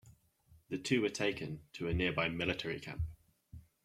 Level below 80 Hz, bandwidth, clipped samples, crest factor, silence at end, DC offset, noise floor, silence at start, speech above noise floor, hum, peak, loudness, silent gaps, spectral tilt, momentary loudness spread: -54 dBFS; 15 kHz; under 0.1%; 20 dB; 0.25 s; under 0.1%; -67 dBFS; 0.05 s; 31 dB; none; -18 dBFS; -37 LUFS; none; -5 dB/octave; 11 LU